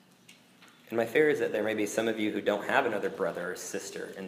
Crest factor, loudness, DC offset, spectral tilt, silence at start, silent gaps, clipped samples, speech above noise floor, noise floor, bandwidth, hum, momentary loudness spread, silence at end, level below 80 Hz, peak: 22 dB; -30 LUFS; under 0.1%; -4 dB/octave; 0.3 s; none; under 0.1%; 28 dB; -58 dBFS; 15.5 kHz; none; 11 LU; 0 s; -80 dBFS; -8 dBFS